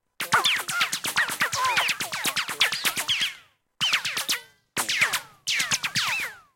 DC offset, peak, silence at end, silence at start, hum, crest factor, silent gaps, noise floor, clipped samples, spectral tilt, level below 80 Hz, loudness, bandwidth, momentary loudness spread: under 0.1%; -8 dBFS; 0.15 s; 0.2 s; none; 18 dB; none; -49 dBFS; under 0.1%; 0.5 dB/octave; -70 dBFS; -24 LUFS; 17 kHz; 6 LU